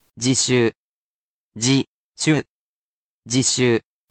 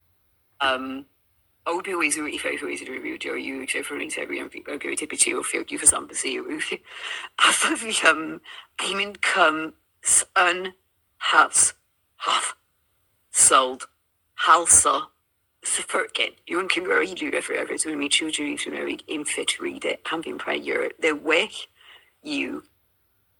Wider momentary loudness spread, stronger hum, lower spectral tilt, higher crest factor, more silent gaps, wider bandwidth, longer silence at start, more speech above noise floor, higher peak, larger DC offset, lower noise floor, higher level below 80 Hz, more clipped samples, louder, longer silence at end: second, 7 LU vs 15 LU; neither; first, -4 dB/octave vs 0 dB/octave; second, 16 dB vs 24 dB; first, 0.76-1.51 s, 1.87-2.13 s, 2.48-3.22 s vs none; second, 10 kHz vs 19 kHz; second, 0.15 s vs 0.6 s; first, over 72 dB vs 45 dB; second, -6 dBFS vs -2 dBFS; neither; first, under -90 dBFS vs -69 dBFS; about the same, -60 dBFS vs -60 dBFS; neither; first, -19 LUFS vs -22 LUFS; second, 0.3 s vs 0.8 s